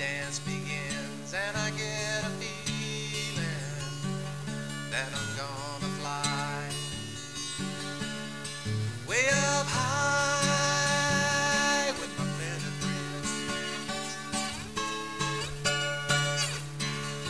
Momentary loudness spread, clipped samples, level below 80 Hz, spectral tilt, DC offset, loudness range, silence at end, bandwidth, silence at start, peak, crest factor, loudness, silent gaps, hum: 10 LU; under 0.1%; -56 dBFS; -3 dB/octave; 0.3%; 7 LU; 0 s; 11 kHz; 0 s; -12 dBFS; 18 dB; -30 LUFS; none; none